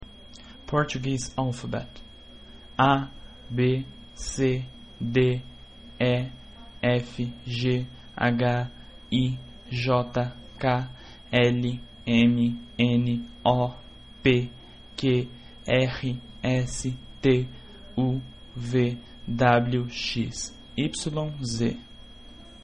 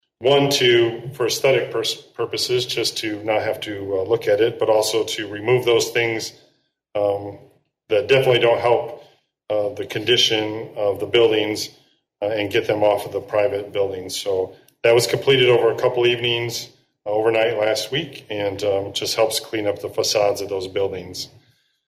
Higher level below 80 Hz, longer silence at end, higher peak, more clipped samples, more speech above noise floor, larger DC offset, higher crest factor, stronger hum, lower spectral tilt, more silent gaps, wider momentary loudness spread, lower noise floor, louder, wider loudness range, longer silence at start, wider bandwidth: first, -48 dBFS vs -62 dBFS; second, 0.1 s vs 0.6 s; about the same, -6 dBFS vs -6 dBFS; neither; second, 22 dB vs 43 dB; first, 0.2% vs under 0.1%; first, 20 dB vs 14 dB; neither; first, -6 dB/octave vs -4 dB/octave; neither; first, 18 LU vs 11 LU; second, -47 dBFS vs -63 dBFS; second, -26 LUFS vs -20 LUFS; about the same, 3 LU vs 3 LU; second, 0 s vs 0.2 s; second, 10.5 kHz vs 16 kHz